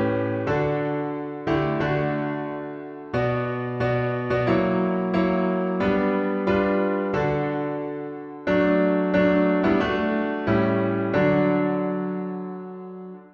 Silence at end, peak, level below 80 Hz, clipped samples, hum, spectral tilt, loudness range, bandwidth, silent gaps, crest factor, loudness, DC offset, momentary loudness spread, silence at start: 0.05 s; -8 dBFS; -50 dBFS; under 0.1%; none; -9 dB/octave; 4 LU; 6.6 kHz; none; 16 dB; -23 LUFS; under 0.1%; 11 LU; 0 s